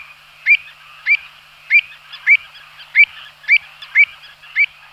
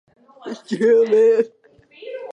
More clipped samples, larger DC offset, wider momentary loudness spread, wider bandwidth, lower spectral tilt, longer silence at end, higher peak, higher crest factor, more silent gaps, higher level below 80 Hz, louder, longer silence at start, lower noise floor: neither; neither; second, 10 LU vs 20 LU; first, 14.5 kHz vs 8 kHz; second, 1 dB/octave vs -6 dB/octave; first, 0.3 s vs 0 s; first, -2 dBFS vs -6 dBFS; about the same, 16 dB vs 14 dB; neither; first, -64 dBFS vs -74 dBFS; first, -14 LUFS vs -17 LUFS; about the same, 0.45 s vs 0.45 s; second, -41 dBFS vs -45 dBFS